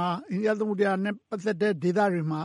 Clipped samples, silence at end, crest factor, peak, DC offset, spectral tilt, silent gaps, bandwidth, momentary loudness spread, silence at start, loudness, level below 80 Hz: under 0.1%; 0 s; 14 dB; -12 dBFS; under 0.1%; -7 dB/octave; none; 11.5 kHz; 6 LU; 0 s; -27 LUFS; -76 dBFS